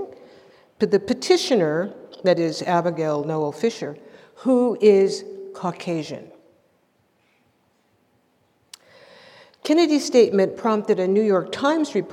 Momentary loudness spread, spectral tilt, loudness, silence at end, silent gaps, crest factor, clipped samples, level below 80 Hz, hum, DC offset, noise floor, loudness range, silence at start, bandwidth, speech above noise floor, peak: 15 LU; -5.5 dB/octave; -21 LUFS; 0 s; none; 18 dB; under 0.1%; -72 dBFS; none; under 0.1%; -64 dBFS; 13 LU; 0 s; 13 kHz; 44 dB; -4 dBFS